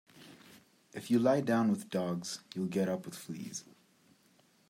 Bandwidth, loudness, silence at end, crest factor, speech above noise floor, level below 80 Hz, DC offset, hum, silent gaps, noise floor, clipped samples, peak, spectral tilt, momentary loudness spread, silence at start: 16 kHz; -33 LUFS; 1.05 s; 20 dB; 35 dB; -80 dBFS; under 0.1%; none; none; -68 dBFS; under 0.1%; -16 dBFS; -6 dB/octave; 18 LU; 0.15 s